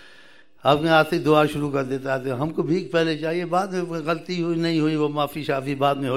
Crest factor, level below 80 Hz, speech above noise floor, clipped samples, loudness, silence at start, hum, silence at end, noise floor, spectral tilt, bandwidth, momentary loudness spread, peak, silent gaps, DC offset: 18 dB; -58 dBFS; 30 dB; under 0.1%; -22 LUFS; 0.65 s; none; 0 s; -52 dBFS; -6.5 dB/octave; 15.5 kHz; 7 LU; -4 dBFS; none; 0.4%